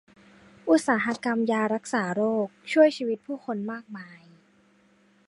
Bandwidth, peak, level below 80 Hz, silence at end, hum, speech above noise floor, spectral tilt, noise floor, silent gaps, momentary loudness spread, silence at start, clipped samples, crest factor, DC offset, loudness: 11.5 kHz; -6 dBFS; -74 dBFS; 1.1 s; none; 36 dB; -5 dB/octave; -62 dBFS; none; 16 LU; 0.65 s; under 0.1%; 20 dB; under 0.1%; -25 LUFS